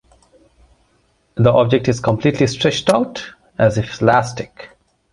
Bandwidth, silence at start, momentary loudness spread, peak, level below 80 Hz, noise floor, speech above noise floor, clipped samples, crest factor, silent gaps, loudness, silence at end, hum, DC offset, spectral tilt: 11.5 kHz; 1.35 s; 17 LU; -2 dBFS; -46 dBFS; -60 dBFS; 44 dB; under 0.1%; 16 dB; none; -16 LUFS; 0.45 s; none; under 0.1%; -6 dB/octave